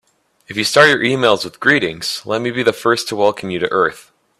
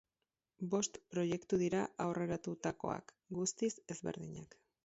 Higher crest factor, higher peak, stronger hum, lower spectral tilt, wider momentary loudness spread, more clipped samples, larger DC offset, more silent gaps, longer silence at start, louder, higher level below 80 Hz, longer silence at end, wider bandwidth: about the same, 16 dB vs 18 dB; first, 0 dBFS vs -22 dBFS; neither; second, -3.5 dB/octave vs -6 dB/octave; about the same, 9 LU vs 11 LU; neither; neither; neither; about the same, 0.5 s vs 0.6 s; first, -15 LUFS vs -39 LUFS; first, -58 dBFS vs -72 dBFS; about the same, 0.4 s vs 0.4 s; first, 14.5 kHz vs 8 kHz